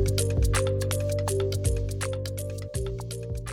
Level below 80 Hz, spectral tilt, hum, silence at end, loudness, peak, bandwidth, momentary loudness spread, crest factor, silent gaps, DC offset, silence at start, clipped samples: -34 dBFS; -5 dB/octave; none; 0 s; -28 LUFS; -12 dBFS; 16.5 kHz; 9 LU; 16 dB; none; under 0.1%; 0 s; under 0.1%